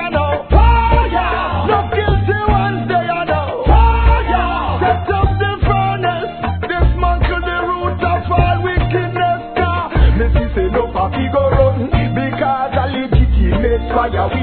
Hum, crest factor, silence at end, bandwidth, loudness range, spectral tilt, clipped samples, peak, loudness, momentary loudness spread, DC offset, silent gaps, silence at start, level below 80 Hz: none; 14 dB; 0 s; 4.5 kHz; 2 LU; -11 dB/octave; under 0.1%; 0 dBFS; -15 LUFS; 5 LU; 0.3%; none; 0 s; -18 dBFS